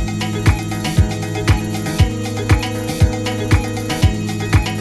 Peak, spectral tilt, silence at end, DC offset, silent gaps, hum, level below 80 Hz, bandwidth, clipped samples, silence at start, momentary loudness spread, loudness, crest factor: 0 dBFS; -5.5 dB/octave; 0 s; under 0.1%; none; none; -24 dBFS; 14.5 kHz; under 0.1%; 0 s; 4 LU; -18 LUFS; 16 dB